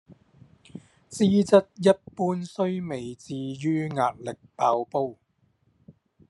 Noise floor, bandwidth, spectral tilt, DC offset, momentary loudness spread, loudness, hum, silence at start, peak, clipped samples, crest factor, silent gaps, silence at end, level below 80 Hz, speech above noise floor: -67 dBFS; 11.5 kHz; -6.5 dB/octave; under 0.1%; 18 LU; -25 LUFS; none; 0.1 s; -4 dBFS; under 0.1%; 22 dB; none; 0.4 s; -68 dBFS; 43 dB